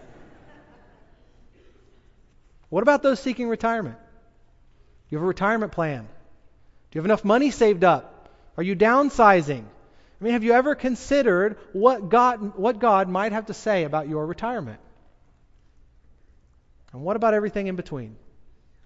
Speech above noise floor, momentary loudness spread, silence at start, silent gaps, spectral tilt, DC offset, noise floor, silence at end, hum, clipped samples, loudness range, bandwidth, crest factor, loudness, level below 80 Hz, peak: 34 dB; 14 LU; 0.2 s; none; -6 dB/octave; under 0.1%; -56 dBFS; 0.7 s; none; under 0.1%; 9 LU; 8 kHz; 22 dB; -22 LUFS; -52 dBFS; -2 dBFS